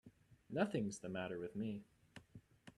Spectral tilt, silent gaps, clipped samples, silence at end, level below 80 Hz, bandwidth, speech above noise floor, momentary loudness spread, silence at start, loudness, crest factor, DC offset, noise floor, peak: -6 dB/octave; none; under 0.1%; 0.05 s; -76 dBFS; 12 kHz; 21 dB; 22 LU; 0.05 s; -44 LUFS; 22 dB; under 0.1%; -63 dBFS; -24 dBFS